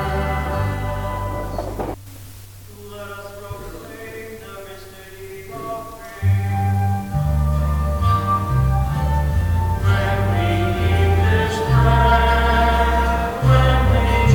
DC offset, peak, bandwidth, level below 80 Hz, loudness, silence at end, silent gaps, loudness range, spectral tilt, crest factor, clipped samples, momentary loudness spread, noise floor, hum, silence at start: 0.3%; -2 dBFS; 18 kHz; -24 dBFS; -19 LUFS; 0 s; none; 17 LU; -6.5 dB/octave; 16 dB; under 0.1%; 20 LU; -39 dBFS; none; 0 s